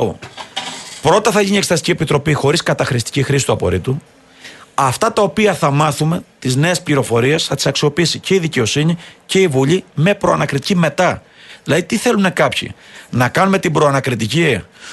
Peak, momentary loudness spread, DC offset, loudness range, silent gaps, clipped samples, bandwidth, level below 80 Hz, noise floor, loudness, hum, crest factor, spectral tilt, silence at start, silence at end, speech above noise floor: 0 dBFS; 9 LU; under 0.1%; 2 LU; none; under 0.1%; 12.5 kHz; -46 dBFS; -39 dBFS; -15 LUFS; none; 16 dB; -5 dB/octave; 0 s; 0 s; 24 dB